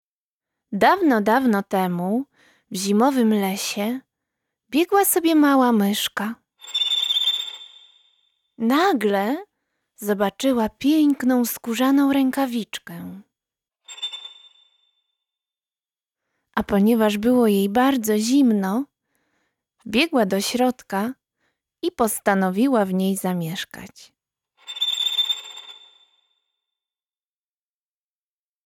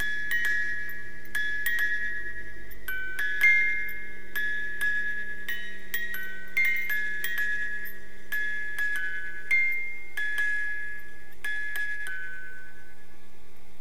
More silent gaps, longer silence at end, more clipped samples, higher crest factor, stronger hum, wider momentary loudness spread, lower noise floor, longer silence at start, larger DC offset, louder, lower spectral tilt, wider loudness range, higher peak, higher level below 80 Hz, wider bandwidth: neither; first, 2.95 s vs 0.05 s; neither; about the same, 18 dB vs 20 dB; neither; about the same, 15 LU vs 15 LU; first, under -90 dBFS vs -55 dBFS; first, 0.7 s vs 0 s; second, under 0.1% vs 5%; first, -20 LUFS vs -28 LUFS; first, -4 dB/octave vs -1.5 dB/octave; about the same, 7 LU vs 5 LU; first, -4 dBFS vs -10 dBFS; about the same, -60 dBFS vs -56 dBFS; first, 19 kHz vs 16.5 kHz